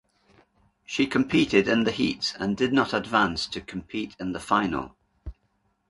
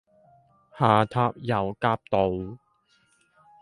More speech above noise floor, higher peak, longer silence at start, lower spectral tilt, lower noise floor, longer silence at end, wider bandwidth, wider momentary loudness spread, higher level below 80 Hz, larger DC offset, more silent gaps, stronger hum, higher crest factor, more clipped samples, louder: first, 46 dB vs 42 dB; about the same, -6 dBFS vs -4 dBFS; first, 0.9 s vs 0.75 s; second, -5 dB/octave vs -8 dB/octave; first, -71 dBFS vs -66 dBFS; second, 0.55 s vs 1.05 s; about the same, 11.5 kHz vs 11.5 kHz; first, 17 LU vs 7 LU; about the same, -50 dBFS vs -54 dBFS; neither; neither; neither; about the same, 20 dB vs 22 dB; neither; about the same, -25 LUFS vs -25 LUFS